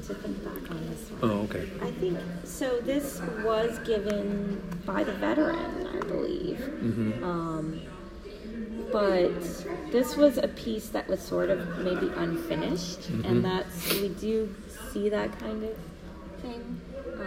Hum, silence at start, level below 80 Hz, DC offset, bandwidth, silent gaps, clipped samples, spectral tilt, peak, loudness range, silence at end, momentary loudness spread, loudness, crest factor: none; 0 s; -48 dBFS; under 0.1%; 16 kHz; none; under 0.1%; -6 dB/octave; -8 dBFS; 4 LU; 0 s; 12 LU; -30 LUFS; 22 dB